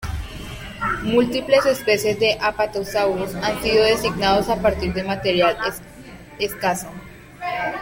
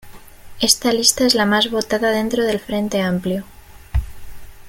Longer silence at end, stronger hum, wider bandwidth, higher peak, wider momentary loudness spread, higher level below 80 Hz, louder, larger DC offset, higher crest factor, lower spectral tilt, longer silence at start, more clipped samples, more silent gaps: about the same, 0 s vs 0 s; neither; about the same, 17 kHz vs 17 kHz; about the same, -2 dBFS vs 0 dBFS; first, 16 LU vs 12 LU; second, -40 dBFS vs -34 dBFS; about the same, -20 LUFS vs -18 LUFS; neither; about the same, 18 dB vs 20 dB; first, -4.5 dB/octave vs -3 dB/octave; about the same, 0 s vs 0.05 s; neither; neither